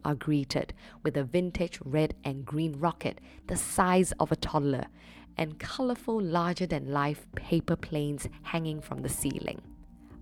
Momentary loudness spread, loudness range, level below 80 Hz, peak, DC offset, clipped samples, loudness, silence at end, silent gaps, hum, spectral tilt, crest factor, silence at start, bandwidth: 9 LU; 3 LU; -50 dBFS; -10 dBFS; under 0.1%; under 0.1%; -31 LUFS; 0 s; none; none; -5.5 dB/octave; 20 dB; 0.05 s; 17.5 kHz